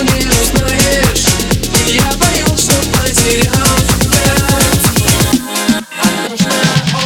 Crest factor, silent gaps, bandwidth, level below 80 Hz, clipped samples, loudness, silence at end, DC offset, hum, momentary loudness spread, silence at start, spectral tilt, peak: 12 dB; none; over 20 kHz; -22 dBFS; under 0.1%; -10 LUFS; 0 s; under 0.1%; none; 4 LU; 0 s; -3.5 dB/octave; 0 dBFS